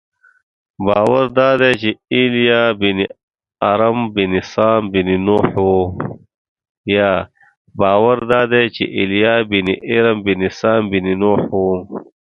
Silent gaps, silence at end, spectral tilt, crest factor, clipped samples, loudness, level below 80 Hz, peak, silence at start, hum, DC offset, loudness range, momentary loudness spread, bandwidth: 3.23-3.28 s, 6.34-6.56 s, 6.69-6.84 s, 7.57-7.65 s; 0.2 s; -7 dB/octave; 16 dB; under 0.1%; -15 LUFS; -44 dBFS; 0 dBFS; 0.8 s; none; under 0.1%; 2 LU; 8 LU; 8.4 kHz